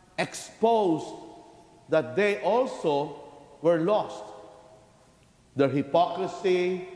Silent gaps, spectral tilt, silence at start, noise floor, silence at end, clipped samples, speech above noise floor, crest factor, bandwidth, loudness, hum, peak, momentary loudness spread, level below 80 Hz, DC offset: none; -5.5 dB/octave; 0.2 s; -59 dBFS; 0 s; under 0.1%; 33 dB; 18 dB; 11 kHz; -26 LUFS; none; -10 dBFS; 18 LU; -68 dBFS; under 0.1%